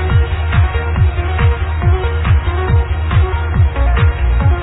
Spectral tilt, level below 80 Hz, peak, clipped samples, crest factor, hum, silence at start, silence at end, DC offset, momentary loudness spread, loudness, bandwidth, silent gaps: -11 dB/octave; -16 dBFS; -2 dBFS; under 0.1%; 10 dB; none; 0 s; 0 s; under 0.1%; 2 LU; -15 LUFS; 4 kHz; none